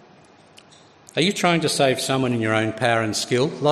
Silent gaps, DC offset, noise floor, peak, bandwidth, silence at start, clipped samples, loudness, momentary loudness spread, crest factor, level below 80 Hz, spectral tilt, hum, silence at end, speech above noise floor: none; under 0.1%; -51 dBFS; -4 dBFS; 14 kHz; 1.15 s; under 0.1%; -21 LUFS; 3 LU; 18 dB; -62 dBFS; -4.5 dB/octave; none; 0 s; 30 dB